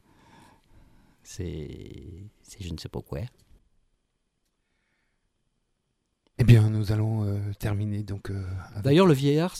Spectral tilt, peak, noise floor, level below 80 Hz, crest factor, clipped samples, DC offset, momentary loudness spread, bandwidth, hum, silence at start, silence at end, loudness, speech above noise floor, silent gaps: -7.5 dB/octave; -4 dBFS; -77 dBFS; -46 dBFS; 24 dB; under 0.1%; under 0.1%; 23 LU; 14.5 kHz; none; 1.3 s; 0 s; -25 LUFS; 51 dB; none